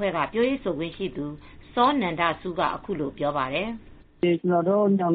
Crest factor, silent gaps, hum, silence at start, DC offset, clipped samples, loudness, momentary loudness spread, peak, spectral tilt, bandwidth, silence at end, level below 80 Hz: 18 dB; none; none; 0 s; under 0.1%; under 0.1%; -25 LUFS; 11 LU; -8 dBFS; -4.5 dB/octave; 4.8 kHz; 0 s; -52 dBFS